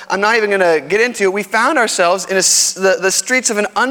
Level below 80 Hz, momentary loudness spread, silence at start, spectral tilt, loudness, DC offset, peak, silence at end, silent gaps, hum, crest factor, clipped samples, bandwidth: -62 dBFS; 4 LU; 0 s; -1.5 dB/octave; -13 LUFS; under 0.1%; 0 dBFS; 0 s; none; none; 14 dB; under 0.1%; 19 kHz